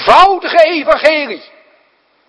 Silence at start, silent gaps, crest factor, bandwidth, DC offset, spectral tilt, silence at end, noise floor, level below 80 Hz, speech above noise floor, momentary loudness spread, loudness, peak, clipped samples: 0 s; none; 12 dB; 11 kHz; under 0.1%; -3 dB/octave; 0.9 s; -55 dBFS; -42 dBFS; 45 dB; 14 LU; -10 LUFS; 0 dBFS; 2%